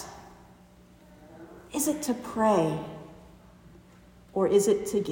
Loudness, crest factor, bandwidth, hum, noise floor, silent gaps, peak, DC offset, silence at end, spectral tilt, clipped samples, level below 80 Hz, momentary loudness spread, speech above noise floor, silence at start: -27 LUFS; 20 dB; 16.5 kHz; 60 Hz at -60 dBFS; -55 dBFS; none; -10 dBFS; under 0.1%; 0 s; -5 dB/octave; under 0.1%; -60 dBFS; 25 LU; 29 dB; 0 s